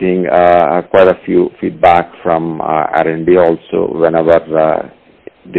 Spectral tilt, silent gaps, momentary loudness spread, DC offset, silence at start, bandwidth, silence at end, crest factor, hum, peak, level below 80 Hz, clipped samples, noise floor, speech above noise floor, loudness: -9 dB/octave; none; 7 LU; under 0.1%; 0 s; 4.6 kHz; 0 s; 12 dB; none; 0 dBFS; -46 dBFS; 0.2%; -38 dBFS; 27 dB; -11 LUFS